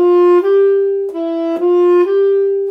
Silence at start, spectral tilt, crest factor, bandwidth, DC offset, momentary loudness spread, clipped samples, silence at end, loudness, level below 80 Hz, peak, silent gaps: 0 s; -6 dB/octave; 8 dB; 4.9 kHz; under 0.1%; 8 LU; under 0.1%; 0 s; -13 LUFS; -66 dBFS; -4 dBFS; none